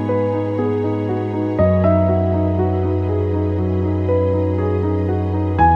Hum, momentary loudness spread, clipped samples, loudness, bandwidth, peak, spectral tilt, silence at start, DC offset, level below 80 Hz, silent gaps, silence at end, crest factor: none; 5 LU; under 0.1%; -18 LUFS; 4.3 kHz; -2 dBFS; -10.5 dB/octave; 0 s; under 0.1%; -38 dBFS; none; 0 s; 14 dB